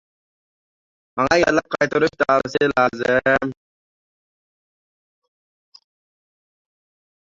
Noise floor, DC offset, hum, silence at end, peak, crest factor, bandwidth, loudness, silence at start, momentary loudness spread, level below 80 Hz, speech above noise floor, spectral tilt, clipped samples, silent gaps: under -90 dBFS; under 0.1%; none; 3.7 s; -2 dBFS; 20 dB; 7.8 kHz; -18 LUFS; 1.15 s; 5 LU; -54 dBFS; over 72 dB; -5 dB/octave; under 0.1%; none